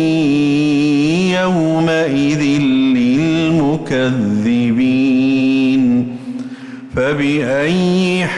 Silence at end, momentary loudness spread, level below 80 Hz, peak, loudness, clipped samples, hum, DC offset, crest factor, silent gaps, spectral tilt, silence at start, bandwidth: 0 s; 5 LU; -46 dBFS; -6 dBFS; -14 LUFS; under 0.1%; none; under 0.1%; 8 dB; none; -6.5 dB/octave; 0 s; 11 kHz